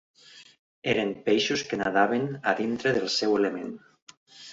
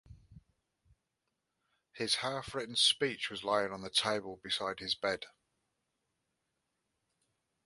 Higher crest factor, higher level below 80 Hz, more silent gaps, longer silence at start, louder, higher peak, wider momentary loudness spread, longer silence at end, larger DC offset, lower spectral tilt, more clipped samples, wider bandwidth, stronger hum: about the same, 20 dB vs 24 dB; first, -64 dBFS vs -70 dBFS; first, 0.59-0.82 s, 4.02-4.07 s, 4.17-4.26 s vs none; first, 0.35 s vs 0.1 s; first, -26 LUFS vs -33 LUFS; first, -8 dBFS vs -16 dBFS; about the same, 12 LU vs 11 LU; second, 0 s vs 2.35 s; neither; first, -4 dB/octave vs -2 dB/octave; neither; second, 8 kHz vs 11.5 kHz; neither